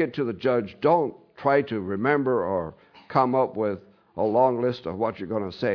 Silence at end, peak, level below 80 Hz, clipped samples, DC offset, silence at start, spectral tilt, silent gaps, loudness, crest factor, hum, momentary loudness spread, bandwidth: 0 s; -6 dBFS; -62 dBFS; under 0.1%; under 0.1%; 0 s; -9 dB/octave; none; -25 LUFS; 18 dB; none; 8 LU; 5.4 kHz